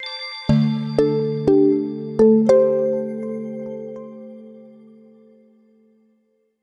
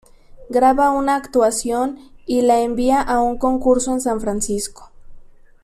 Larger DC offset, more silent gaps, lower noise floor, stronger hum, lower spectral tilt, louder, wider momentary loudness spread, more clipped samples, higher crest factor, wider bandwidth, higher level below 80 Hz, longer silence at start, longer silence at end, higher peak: neither; neither; first, -65 dBFS vs -40 dBFS; neither; first, -8 dB/octave vs -4 dB/octave; about the same, -19 LUFS vs -18 LUFS; first, 21 LU vs 7 LU; neither; about the same, 18 dB vs 14 dB; second, 8.8 kHz vs 14 kHz; second, -48 dBFS vs -40 dBFS; second, 0 s vs 0.35 s; first, 1.95 s vs 0.4 s; about the same, -4 dBFS vs -4 dBFS